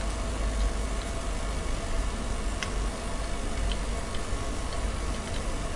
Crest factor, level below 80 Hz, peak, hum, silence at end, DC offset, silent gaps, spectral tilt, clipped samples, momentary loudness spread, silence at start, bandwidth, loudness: 16 dB; -32 dBFS; -14 dBFS; none; 0 s; under 0.1%; none; -4.5 dB/octave; under 0.1%; 3 LU; 0 s; 11.5 kHz; -33 LUFS